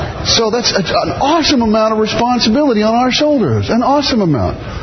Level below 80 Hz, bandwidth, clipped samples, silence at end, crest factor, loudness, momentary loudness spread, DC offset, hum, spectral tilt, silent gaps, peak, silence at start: -34 dBFS; 6.4 kHz; under 0.1%; 0 s; 12 dB; -12 LUFS; 3 LU; under 0.1%; none; -4.5 dB/octave; none; 0 dBFS; 0 s